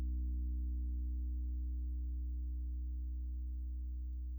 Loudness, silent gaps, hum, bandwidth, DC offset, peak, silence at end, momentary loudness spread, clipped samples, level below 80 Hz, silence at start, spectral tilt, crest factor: -43 LUFS; none; 60 Hz at -85 dBFS; 0.4 kHz; under 0.1%; -34 dBFS; 0 s; 4 LU; under 0.1%; -40 dBFS; 0 s; -12 dB/octave; 6 dB